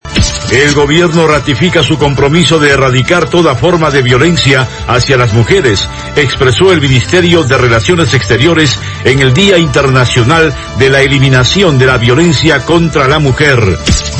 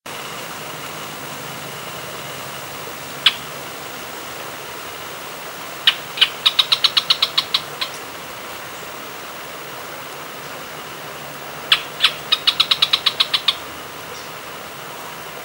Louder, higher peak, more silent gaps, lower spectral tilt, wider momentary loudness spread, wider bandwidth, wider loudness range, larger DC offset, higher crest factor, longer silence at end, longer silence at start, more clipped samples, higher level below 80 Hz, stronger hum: first, -7 LUFS vs -20 LUFS; about the same, 0 dBFS vs 0 dBFS; neither; first, -5 dB/octave vs -1 dB/octave; second, 4 LU vs 16 LU; second, 11 kHz vs 17 kHz; second, 1 LU vs 12 LU; first, 0.2% vs under 0.1%; second, 8 dB vs 24 dB; about the same, 0 s vs 0 s; about the same, 0.05 s vs 0.05 s; first, 2% vs under 0.1%; first, -24 dBFS vs -60 dBFS; neither